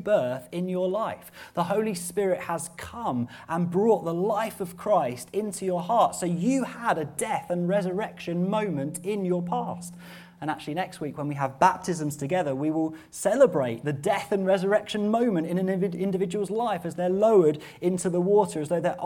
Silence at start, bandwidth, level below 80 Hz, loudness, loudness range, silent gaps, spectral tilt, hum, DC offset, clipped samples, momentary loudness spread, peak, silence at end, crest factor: 0 s; 17.5 kHz; -64 dBFS; -26 LUFS; 4 LU; none; -6 dB/octave; none; under 0.1%; under 0.1%; 9 LU; -6 dBFS; 0 s; 20 dB